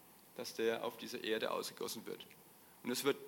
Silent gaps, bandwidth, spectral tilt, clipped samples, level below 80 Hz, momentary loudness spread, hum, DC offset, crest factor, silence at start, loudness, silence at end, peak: none; 17.5 kHz; -3 dB/octave; under 0.1%; -88 dBFS; 17 LU; none; under 0.1%; 22 dB; 0 s; -41 LUFS; 0 s; -20 dBFS